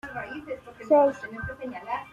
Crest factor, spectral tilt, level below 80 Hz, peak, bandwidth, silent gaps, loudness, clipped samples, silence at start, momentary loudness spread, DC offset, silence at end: 18 dB; -7 dB/octave; -56 dBFS; -10 dBFS; 7.4 kHz; none; -26 LUFS; under 0.1%; 0.05 s; 17 LU; under 0.1%; 0 s